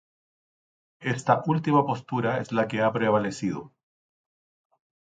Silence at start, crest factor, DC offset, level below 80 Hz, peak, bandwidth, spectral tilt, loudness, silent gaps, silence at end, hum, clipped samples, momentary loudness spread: 1 s; 20 dB; under 0.1%; -66 dBFS; -6 dBFS; 9.4 kHz; -6.5 dB/octave; -25 LUFS; none; 1.45 s; none; under 0.1%; 9 LU